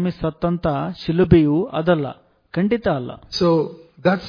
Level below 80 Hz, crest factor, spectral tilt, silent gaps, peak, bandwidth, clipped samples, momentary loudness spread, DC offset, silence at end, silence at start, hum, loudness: -40 dBFS; 18 dB; -8 dB/octave; none; -2 dBFS; 5.4 kHz; under 0.1%; 11 LU; under 0.1%; 0 s; 0 s; none; -20 LUFS